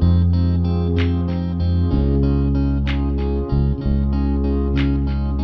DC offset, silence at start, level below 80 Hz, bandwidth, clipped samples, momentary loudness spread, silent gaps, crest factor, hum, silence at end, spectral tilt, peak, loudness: under 0.1%; 0 s; -22 dBFS; 5.8 kHz; under 0.1%; 3 LU; none; 12 dB; none; 0 s; -10.5 dB/octave; -6 dBFS; -19 LUFS